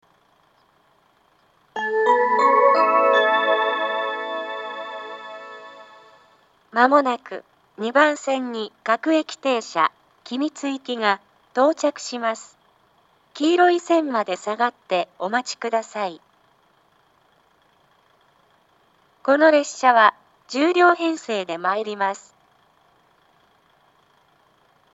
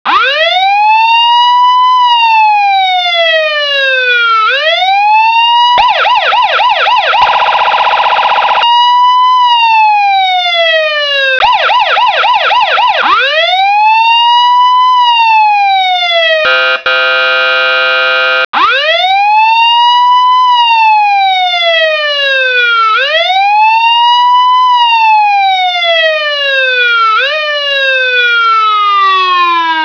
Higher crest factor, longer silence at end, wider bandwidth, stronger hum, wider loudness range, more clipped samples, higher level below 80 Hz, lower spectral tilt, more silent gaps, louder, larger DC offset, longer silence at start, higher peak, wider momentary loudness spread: first, 22 dB vs 8 dB; first, 2.75 s vs 0 s; first, 8.2 kHz vs 5.4 kHz; neither; first, 10 LU vs 1 LU; neither; second, -80 dBFS vs -52 dBFS; first, -3 dB/octave vs 0 dB/octave; second, none vs 18.45-18.53 s; second, -20 LUFS vs -7 LUFS; neither; first, 1.75 s vs 0.05 s; about the same, 0 dBFS vs 0 dBFS; first, 16 LU vs 3 LU